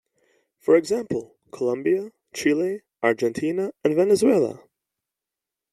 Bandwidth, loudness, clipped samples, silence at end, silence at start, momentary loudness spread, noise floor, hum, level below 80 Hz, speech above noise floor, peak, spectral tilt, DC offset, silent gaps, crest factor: 13 kHz; -23 LUFS; under 0.1%; 1.2 s; 0.65 s; 12 LU; -87 dBFS; none; -66 dBFS; 66 dB; -6 dBFS; -5.5 dB/octave; under 0.1%; none; 18 dB